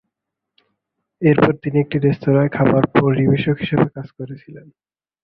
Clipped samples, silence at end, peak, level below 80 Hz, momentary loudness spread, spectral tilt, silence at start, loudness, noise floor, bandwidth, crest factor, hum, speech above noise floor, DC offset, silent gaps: under 0.1%; 0.65 s; 0 dBFS; -50 dBFS; 17 LU; -10.5 dB/octave; 1.2 s; -17 LUFS; -81 dBFS; 5.2 kHz; 18 dB; none; 64 dB; under 0.1%; none